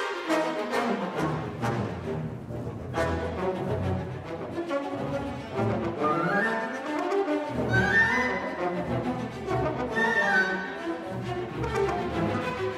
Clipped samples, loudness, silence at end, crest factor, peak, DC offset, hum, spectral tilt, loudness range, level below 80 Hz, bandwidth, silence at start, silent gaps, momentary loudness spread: under 0.1%; -28 LUFS; 0 s; 18 dB; -10 dBFS; under 0.1%; none; -6 dB/octave; 6 LU; -48 dBFS; 15 kHz; 0 s; none; 10 LU